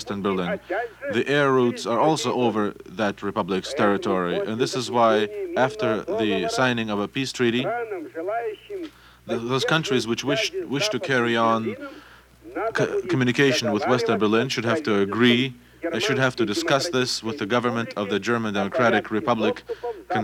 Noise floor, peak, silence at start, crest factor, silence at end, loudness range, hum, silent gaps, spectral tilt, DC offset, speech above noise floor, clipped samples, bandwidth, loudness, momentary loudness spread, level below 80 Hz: -46 dBFS; -6 dBFS; 0 s; 18 dB; 0 s; 4 LU; none; none; -4.5 dB/octave; under 0.1%; 23 dB; under 0.1%; 16.5 kHz; -23 LUFS; 10 LU; -60 dBFS